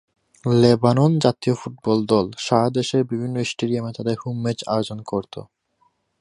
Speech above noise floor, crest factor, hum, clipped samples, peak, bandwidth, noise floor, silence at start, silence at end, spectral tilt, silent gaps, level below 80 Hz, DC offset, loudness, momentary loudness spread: 45 dB; 20 dB; none; under 0.1%; -2 dBFS; 11.5 kHz; -65 dBFS; 0.45 s; 0.75 s; -6.5 dB/octave; none; -56 dBFS; under 0.1%; -21 LUFS; 11 LU